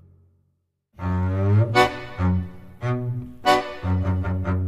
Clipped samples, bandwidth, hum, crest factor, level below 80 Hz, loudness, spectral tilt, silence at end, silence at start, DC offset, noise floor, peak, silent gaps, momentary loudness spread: under 0.1%; 13.5 kHz; none; 20 dB; -42 dBFS; -23 LUFS; -6.5 dB/octave; 0 s; 1 s; under 0.1%; -71 dBFS; -2 dBFS; none; 10 LU